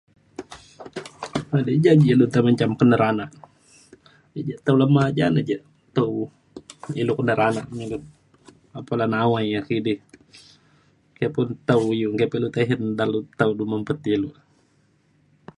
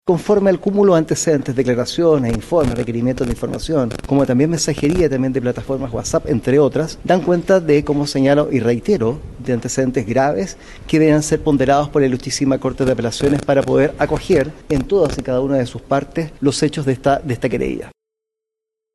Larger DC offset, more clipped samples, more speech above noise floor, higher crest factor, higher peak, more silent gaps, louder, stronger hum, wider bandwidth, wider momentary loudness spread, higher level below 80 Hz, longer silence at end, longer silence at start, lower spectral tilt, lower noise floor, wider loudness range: neither; neither; second, 41 dB vs 67 dB; first, 20 dB vs 14 dB; about the same, -4 dBFS vs -4 dBFS; neither; second, -22 LUFS vs -17 LUFS; neither; second, 11 kHz vs 12.5 kHz; first, 20 LU vs 7 LU; second, -58 dBFS vs -36 dBFS; first, 1.25 s vs 1.05 s; first, 0.4 s vs 0.05 s; first, -7.5 dB/octave vs -6 dB/octave; second, -62 dBFS vs -83 dBFS; first, 6 LU vs 2 LU